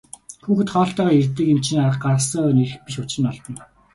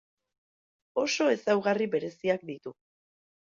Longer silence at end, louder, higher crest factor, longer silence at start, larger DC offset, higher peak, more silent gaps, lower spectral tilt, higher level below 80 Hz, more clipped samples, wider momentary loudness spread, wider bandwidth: second, 0.3 s vs 0.85 s; first, -19 LUFS vs -28 LUFS; about the same, 14 dB vs 18 dB; second, 0.3 s vs 0.95 s; neither; first, -6 dBFS vs -12 dBFS; neither; first, -6 dB/octave vs -4 dB/octave; first, -54 dBFS vs -76 dBFS; neither; about the same, 17 LU vs 15 LU; first, 11.5 kHz vs 7.6 kHz